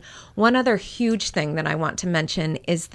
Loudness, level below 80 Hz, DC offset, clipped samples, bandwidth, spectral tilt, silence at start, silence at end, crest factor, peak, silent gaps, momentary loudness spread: -22 LUFS; -50 dBFS; under 0.1%; under 0.1%; 11 kHz; -4.5 dB/octave; 0.05 s; 0.1 s; 18 dB; -4 dBFS; none; 6 LU